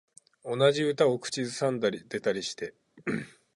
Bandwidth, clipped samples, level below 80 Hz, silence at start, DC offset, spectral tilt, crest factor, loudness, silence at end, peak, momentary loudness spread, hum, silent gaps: 11.5 kHz; under 0.1%; -70 dBFS; 0.45 s; under 0.1%; -4.5 dB/octave; 20 dB; -29 LUFS; 0.3 s; -10 dBFS; 14 LU; none; none